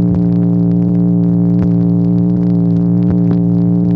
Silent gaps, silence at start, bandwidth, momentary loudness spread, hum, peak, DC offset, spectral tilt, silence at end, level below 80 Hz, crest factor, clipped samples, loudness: none; 0 s; 1.9 kHz; 0 LU; none; -2 dBFS; under 0.1%; -13 dB/octave; 0 s; -36 dBFS; 8 dB; under 0.1%; -12 LUFS